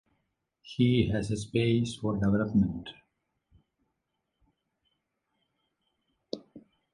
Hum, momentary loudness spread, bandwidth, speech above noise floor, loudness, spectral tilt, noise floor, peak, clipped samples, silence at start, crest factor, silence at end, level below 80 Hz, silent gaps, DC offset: none; 17 LU; 11 kHz; 55 dB; -28 LUFS; -7 dB/octave; -82 dBFS; -12 dBFS; under 0.1%; 0.65 s; 20 dB; 0.35 s; -52 dBFS; none; under 0.1%